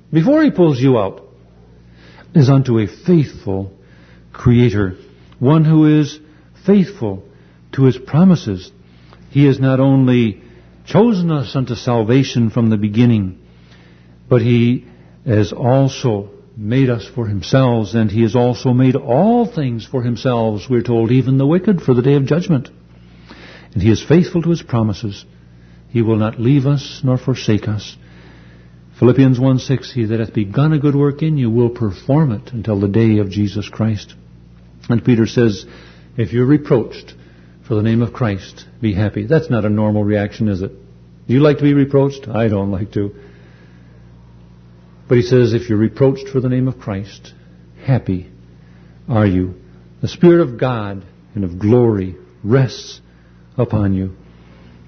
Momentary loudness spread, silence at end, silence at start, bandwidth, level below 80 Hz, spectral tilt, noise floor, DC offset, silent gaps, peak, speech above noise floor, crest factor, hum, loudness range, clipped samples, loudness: 13 LU; 0.75 s; 0.1 s; 6.6 kHz; -44 dBFS; -8.5 dB/octave; -45 dBFS; under 0.1%; none; 0 dBFS; 30 dB; 16 dB; none; 4 LU; under 0.1%; -15 LUFS